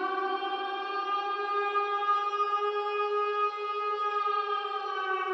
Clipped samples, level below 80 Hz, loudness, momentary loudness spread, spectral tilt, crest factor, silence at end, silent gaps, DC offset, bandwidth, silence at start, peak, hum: under 0.1%; under -90 dBFS; -30 LUFS; 5 LU; -1 dB/octave; 12 dB; 0 s; none; under 0.1%; 7.8 kHz; 0 s; -18 dBFS; none